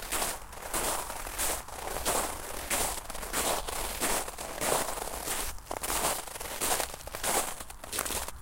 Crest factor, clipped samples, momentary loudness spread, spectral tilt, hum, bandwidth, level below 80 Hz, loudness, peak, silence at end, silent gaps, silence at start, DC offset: 22 dB; under 0.1%; 7 LU; -1.5 dB/octave; none; 17 kHz; -46 dBFS; -32 LUFS; -10 dBFS; 0 s; none; 0 s; under 0.1%